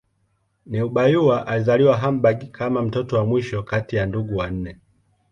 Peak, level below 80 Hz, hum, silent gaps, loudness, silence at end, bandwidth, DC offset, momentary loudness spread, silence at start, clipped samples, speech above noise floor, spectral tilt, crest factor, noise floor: -4 dBFS; -46 dBFS; none; none; -21 LUFS; 0.6 s; 7.2 kHz; under 0.1%; 10 LU; 0.65 s; under 0.1%; 48 dB; -8 dB/octave; 18 dB; -67 dBFS